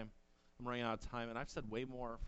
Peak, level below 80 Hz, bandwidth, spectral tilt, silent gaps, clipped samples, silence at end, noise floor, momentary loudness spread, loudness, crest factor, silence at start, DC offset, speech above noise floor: -26 dBFS; -58 dBFS; 8.2 kHz; -5.5 dB/octave; none; under 0.1%; 0 s; -67 dBFS; 6 LU; -45 LUFS; 18 dB; 0 s; under 0.1%; 23 dB